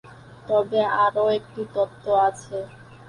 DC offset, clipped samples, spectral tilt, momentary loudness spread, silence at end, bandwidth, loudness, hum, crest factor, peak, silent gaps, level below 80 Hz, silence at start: under 0.1%; under 0.1%; -5 dB/octave; 14 LU; 0.05 s; 11 kHz; -23 LUFS; none; 16 dB; -8 dBFS; none; -60 dBFS; 0.1 s